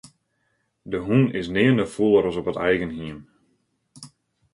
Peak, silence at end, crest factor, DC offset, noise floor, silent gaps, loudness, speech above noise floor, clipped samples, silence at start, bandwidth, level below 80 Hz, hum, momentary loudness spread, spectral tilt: -6 dBFS; 0.45 s; 18 dB; under 0.1%; -71 dBFS; none; -22 LUFS; 50 dB; under 0.1%; 0.85 s; 11.5 kHz; -52 dBFS; none; 14 LU; -7 dB/octave